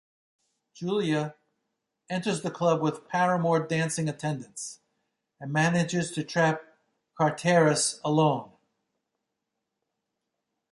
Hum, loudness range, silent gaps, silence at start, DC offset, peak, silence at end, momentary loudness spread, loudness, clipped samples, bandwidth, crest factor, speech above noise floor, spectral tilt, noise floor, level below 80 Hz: none; 3 LU; none; 0.75 s; under 0.1%; -8 dBFS; 2.25 s; 12 LU; -27 LUFS; under 0.1%; 11.5 kHz; 20 dB; 58 dB; -5 dB/octave; -84 dBFS; -70 dBFS